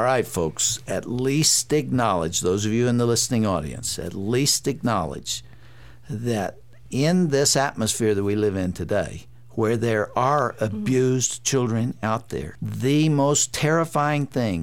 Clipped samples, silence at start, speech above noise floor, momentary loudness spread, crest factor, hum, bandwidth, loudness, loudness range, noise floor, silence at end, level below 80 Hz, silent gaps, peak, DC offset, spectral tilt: under 0.1%; 0 s; 25 dB; 9 LU; 16 dB; none; 17 kHz; -22 LUFS; 3 LU; -47 dBFS; 0 s; -50 dBFS; none; -6 dBFS; 0.5%; -4.5 dB/octave